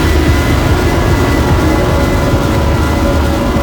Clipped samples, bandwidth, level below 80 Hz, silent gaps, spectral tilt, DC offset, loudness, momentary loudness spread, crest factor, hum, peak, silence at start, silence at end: under 0.1%; 19.5 kHz; -16 dBFS; none; -6 dB/octave; under 0.1%; -12 LUFS; 1 LU; 10 dB; none; 0 dBFS; 0 s; 0 s